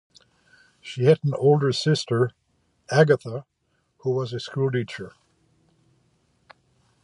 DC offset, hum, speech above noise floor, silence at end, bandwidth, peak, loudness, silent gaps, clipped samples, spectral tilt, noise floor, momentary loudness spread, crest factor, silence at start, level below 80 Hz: under 0.1%; none; 49 dB; 1.95 s; 11 kHz; -4 dBFS; -23 LUFS; none; under 0.1%; -6.5 dB/octave; -71 dBFS; 17 LU; 22 dB; 0.85 s; -66 dBFS